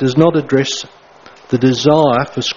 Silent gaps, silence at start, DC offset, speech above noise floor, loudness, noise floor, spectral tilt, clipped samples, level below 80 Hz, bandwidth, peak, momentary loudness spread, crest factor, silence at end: none; 0 s; under 0.1%; 28 dB; -14 LUFS; -41 dBFS; -5.5 dB/octave; under 0.1%; -52 dBFS; 7.6 kHz; 0 dBFS; 10 LU; 14 dB; 0 s